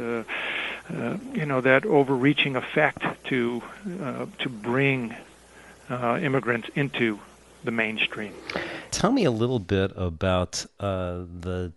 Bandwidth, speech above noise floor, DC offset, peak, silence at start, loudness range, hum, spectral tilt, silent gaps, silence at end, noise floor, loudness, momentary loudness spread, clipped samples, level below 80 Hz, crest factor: 11.5 kHz; 24 dB; under 0.1%; -4 dBFS; 0 s; 4 LU; none; -5.5 dB/octave; none; 0.05 s; -50 dBFS; -26 LUFS; 12 LU; under 0.1%; -56 dBFS; 22 dB